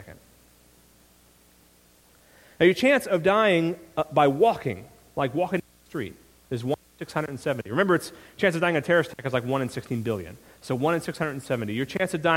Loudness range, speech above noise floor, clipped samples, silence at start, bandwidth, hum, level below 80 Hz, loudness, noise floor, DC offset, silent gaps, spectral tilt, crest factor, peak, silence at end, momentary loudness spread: 5 LU; 33 dB; under 0.1%; 0 s; 17 kHz; none; -60 dBFS; -25 LUFS; -58 dBFS; under 0.1%; none; -6 dB/octave; 20 dB; -6 dBFS; 0 s; 14 LU